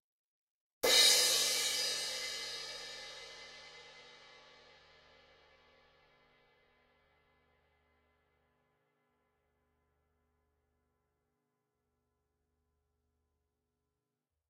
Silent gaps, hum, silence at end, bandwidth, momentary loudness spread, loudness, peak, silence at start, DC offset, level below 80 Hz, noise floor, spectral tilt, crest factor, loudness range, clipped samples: none; none; 10.45 s; 16 kHz; 26 LU; -29 LUFS; -14 dBFS; 0.85 s; under 0.1%; -76 dBFS; -89 dBFS; 2 dB/octave; 28 dB; 23 LU; under 0.1%